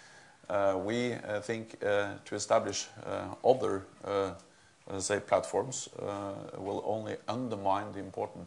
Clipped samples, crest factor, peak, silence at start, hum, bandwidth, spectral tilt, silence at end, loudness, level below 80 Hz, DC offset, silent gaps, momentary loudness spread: under 0.1%; 22 dB; -10 dBFS; 0 s; none; 11 kHz; -4 dB/octave; 0 s; -33 LUFS; -76 dBFS; under 0.1%; none; 9 LU